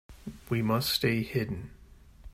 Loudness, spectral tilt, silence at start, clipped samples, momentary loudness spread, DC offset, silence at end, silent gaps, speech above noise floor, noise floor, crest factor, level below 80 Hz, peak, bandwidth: -30 LUFS; -5 dB/octave; 0.1 s; under 0.1%; 19 LU; under 0.1%; 0.05 s; none; 24 dB; -53 dBFS; 18 dB; -52 dBFS; -12 dBFS; 16 kHz